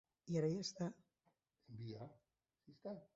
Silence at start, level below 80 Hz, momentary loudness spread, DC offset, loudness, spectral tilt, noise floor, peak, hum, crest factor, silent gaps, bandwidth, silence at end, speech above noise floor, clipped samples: 0.25 s; -80 dBFS; 16 LU; under 0.1%; -46 LUFS; -7 dB/octave; -84 dBFS; -28 dBFS; none; 20 dB; none; 7.6 kHz; 0.1 s; 39 dB; under 0.1%